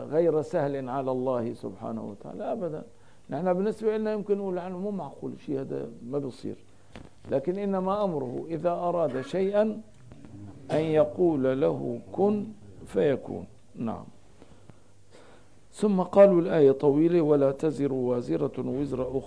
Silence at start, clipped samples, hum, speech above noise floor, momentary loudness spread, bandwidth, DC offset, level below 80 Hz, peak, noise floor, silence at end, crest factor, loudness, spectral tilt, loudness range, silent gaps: 0 s; under 0.1%; none; 30 dB; 16 LU; 10.5 kHz; 0.3%; -60 dBFS; -6 dBFS; -56 dBFS; 0 s; 20 dB; -27 LUFS; -8.5 dB/octave; 10 LU; none